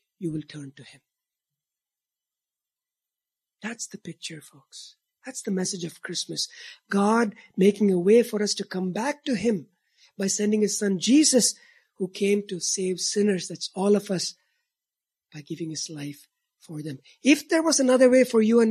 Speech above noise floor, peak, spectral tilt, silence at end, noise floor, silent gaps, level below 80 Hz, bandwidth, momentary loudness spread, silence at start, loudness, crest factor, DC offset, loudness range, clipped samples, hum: over 66 dB; -6 dBFS; -4 dB/octave; 0 s; under -90 dBFS; none; -72 dBFS; 14 kHz; 19 LU; 0.2 s; -24 LUFS; 20 dB; under 0.1%; 17 LU; under 0.1%; none